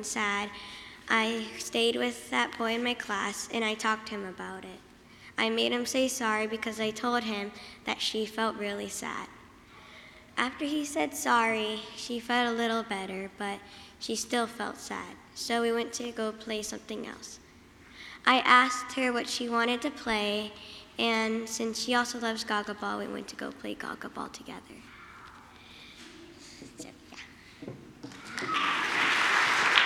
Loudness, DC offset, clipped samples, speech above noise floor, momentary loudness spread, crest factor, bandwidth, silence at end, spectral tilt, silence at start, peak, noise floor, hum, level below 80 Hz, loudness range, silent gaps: -30 LUFS; under 0.1%; under 0.1%; 24 dB; 21 LU; 28 dB; 16.5 kHz; 0 s; -2 dB/octave; 0 s; -4 dBFS; -55 dBFS; none; -64 dBFS; 12 LU; none